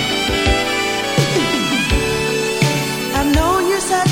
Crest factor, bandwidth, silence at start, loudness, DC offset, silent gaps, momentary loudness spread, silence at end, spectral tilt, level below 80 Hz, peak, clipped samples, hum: 16 dB; 18 kHz; 0 s; -16 LUFS; under 0.1%; none; 2 LU; 0 s; -4 dB/octave; -28 dBFS; 0 dBFS; under 0.1%; none